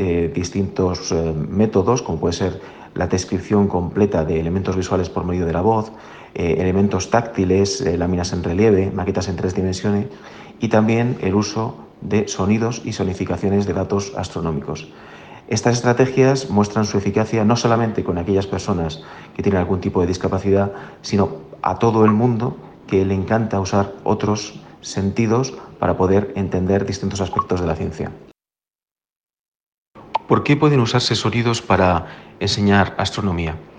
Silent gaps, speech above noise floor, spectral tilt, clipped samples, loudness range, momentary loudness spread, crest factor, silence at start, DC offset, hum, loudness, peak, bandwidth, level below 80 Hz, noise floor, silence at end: 28.75-28.79 s, 28.91-28.96 s, 29.12-29.27 s, 29.39-29.93 s; over 71 dB; -6 dB/octave; under 0.1%; 4 LU; 11 LU; 16 dB; 0 s; under 0.1%; none; -19 LUFS; -2 dBFS; 9.4 kHz; -42 dBFS; under -90 dBFS; 0 s